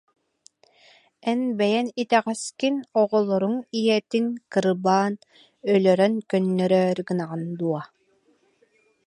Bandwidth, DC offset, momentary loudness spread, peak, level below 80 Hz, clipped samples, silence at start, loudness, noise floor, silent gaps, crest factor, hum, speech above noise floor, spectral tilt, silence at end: 11.5 kHz; under 0.1%; 8 LU; -6 dBFS; -72 dBFS; under 0.1%; 1.25 s; -23 LUFS; -64 dBFS; none; 18 dB; none; 42 dB; -6 dB/octave; 1.2 s